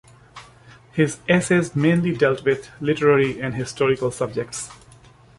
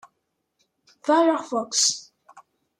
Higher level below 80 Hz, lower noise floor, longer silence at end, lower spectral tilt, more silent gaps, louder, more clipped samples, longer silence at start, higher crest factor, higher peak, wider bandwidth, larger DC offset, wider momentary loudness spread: first, -54 dBFS vs -80 dBFS; second, -49 dBFS vs -76 dBFS; first, 0.65 s vs 0.4 s; first, -6 dB/octave vs -0.5 dB/octave; neither; about the same, -21 LUFS vs -22 LUFS; neither; second, 0.35 s vs 1.05 s; about the same, 18 dB vs 20 dB; first, -2 dBFS vs -6 dBFS; second, 11.5 kHz vs 14.5 kHz; neither; about the same, 10 LU vs 11 LU